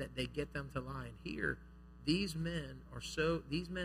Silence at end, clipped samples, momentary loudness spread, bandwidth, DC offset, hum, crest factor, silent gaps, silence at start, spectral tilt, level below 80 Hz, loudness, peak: 0 s; under 0.1%; 11 LU; 15.5 kHz; under 0.1%; none; 20 dB; none; 0 s; -5.5 dB/octave; -54 dBFS; -40 LUFS; -20 dBFS